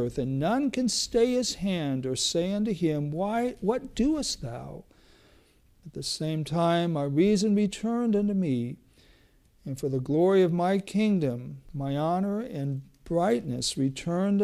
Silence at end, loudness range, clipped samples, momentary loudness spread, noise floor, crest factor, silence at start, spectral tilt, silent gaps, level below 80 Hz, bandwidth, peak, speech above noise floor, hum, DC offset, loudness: 0 s; 4 LU; under 0.1%; 12 LU; -61 dBFS; 16 dB; 0 s; -5.5 dB/octave; none; -52 dBFS; 14.5 kHz; -12 dBFS; 34 dB; none; under 0.1%; -27 LUFS